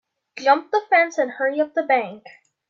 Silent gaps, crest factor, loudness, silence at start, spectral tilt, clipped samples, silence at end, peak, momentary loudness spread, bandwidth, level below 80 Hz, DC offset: none; 18 dB; -20 LUFS; 0.35 s; -3.5 dB/octave; under 0.1%; 0.5 s; -4 dBFS; 6 LU; 7.4 kHz; -82 dBFS; under 0.1%